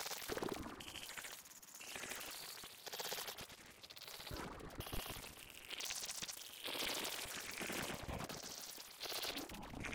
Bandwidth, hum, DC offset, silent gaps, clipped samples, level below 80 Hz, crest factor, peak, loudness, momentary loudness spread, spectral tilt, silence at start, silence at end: 18 kHz; none; under 0.1%; none; under 0.1%; -62 dBFS; 20 dB; -28 dBFS; -46 LUFS; 9 LU; -2 dB/octave; 0 s; 0 s